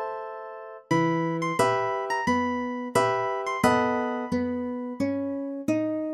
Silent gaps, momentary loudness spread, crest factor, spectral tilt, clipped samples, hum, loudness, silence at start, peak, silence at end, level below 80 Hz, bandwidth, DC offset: none; 9 LU; 18 dB; -5.5 dB/octave; under 0.1%; none; -26 LUFS; 0 s; -8 dBFS; 0 s; -62 dBFS; 14 kHz; under 0.1%